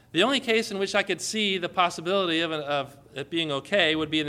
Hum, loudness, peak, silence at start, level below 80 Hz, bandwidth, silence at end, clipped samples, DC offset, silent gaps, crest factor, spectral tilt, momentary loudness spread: none; -25 LUFS; -6 dBFS; 0.15 s; -64 dBFS; 15.5 kHz; 0 s; under 0.1%; under 0.1%; none; 20 dB; -3.5 dB/octave; 7 LU